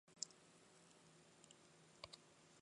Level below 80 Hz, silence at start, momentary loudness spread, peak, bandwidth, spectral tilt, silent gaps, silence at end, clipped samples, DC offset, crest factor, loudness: -88 dBFS; 0.05 s; 15 LU; -24 dBFS; 11 kHz; -1 dB/octave; none; 0 s; under 0.1%; under 0.1%; 38 dB; -60 LUFS